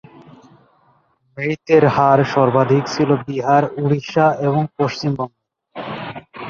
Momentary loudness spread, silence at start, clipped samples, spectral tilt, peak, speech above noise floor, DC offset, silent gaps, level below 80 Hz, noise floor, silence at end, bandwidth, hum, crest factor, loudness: 15 LU; 1.35 s; under 0.1%; -7 dB/octave; -2 dBFS; 43 dB; under 0.1%; none; -56 dBFS; -59 dBFS; 0 s; 7.2 kHz; none; 16 dB; -17 LUFS